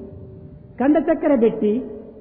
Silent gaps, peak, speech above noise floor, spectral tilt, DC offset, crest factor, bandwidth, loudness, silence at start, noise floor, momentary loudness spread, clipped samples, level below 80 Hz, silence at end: none; -6 dBFS; 23 dB; -12 dB/octave; under 0.1%; 14 dB; 3.6 kHz; -19 LUFS; 0 s; -40 dBFS; 22 LU; under 0.1%; -50 dBFS; 0 s